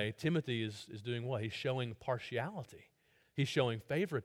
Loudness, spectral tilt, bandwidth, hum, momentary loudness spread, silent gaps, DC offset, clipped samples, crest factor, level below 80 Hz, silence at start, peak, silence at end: -38 LUFS; -6 dB/octave; 16 kHz; none; 10 LU; none; under 0.1%; under 0.1%; 18 dB; -72 dBFS; 0 s; -20 dBFS; 0 s